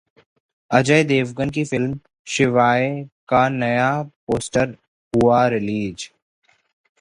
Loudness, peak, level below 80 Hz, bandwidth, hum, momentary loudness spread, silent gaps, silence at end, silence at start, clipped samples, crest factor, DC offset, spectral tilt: -19 LUFS; 0 dBFS; -50 dBFS; 11.5 kHz; none; 11 LU; 2.19-2.25 s, 3.12-3.27 s, 4.16-4.27 s, 4.88-5.11 s; 0.95 s; 0.7 s; under 0.1%; 20 dB; under 0.1%; -5.5 dB/octave